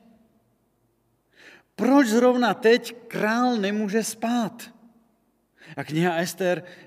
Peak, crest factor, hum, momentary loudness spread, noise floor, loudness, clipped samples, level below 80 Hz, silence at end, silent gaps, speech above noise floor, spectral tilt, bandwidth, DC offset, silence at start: -6 dBFS; 18 dB; none; 17 LU; -68 dBFS; -23 LUFS; under 0.1%; -78 dBFS; 0.1 s; none; 46 dB; -5 dB/octave; 16 kHz; under 0.1%; 1.8 s